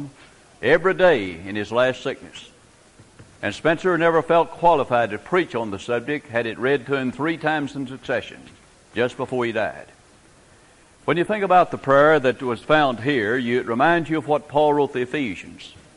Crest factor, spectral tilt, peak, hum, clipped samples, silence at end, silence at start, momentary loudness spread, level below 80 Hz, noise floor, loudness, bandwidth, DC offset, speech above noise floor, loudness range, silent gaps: 18 dB; -6 dB/octave; -4 dBFS; none; under 0.1%; 0.25 s; 0 s; 13 LU; -56 dBFS; -52 dBFS; -21 LUFS; 11.5 kHz; under 0.1%; 31 dB; 7 LU; none